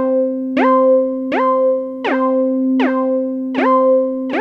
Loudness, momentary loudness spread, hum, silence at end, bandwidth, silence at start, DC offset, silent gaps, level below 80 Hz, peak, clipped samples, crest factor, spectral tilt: -15 LUFS; 7 LU; none; 0 s; 5.6 kHz; 0 s; under 0.1%; none; -64 dBFS; -4 dBFS; under 0.1%; 12 dB; -6.5 dB/octave